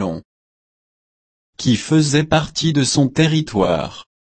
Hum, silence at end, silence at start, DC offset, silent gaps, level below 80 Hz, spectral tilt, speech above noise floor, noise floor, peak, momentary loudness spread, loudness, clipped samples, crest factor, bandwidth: none; 0.2 s; 0 s; under 0.1%; 0.25-1.53 s; -46 dBFS; -5 dB/octave; over 74 dB; under -90 dBFS; -2 dBFS; 9 LU; -17 LUFS; under 0.1%; 16 dB; 8.8 kHz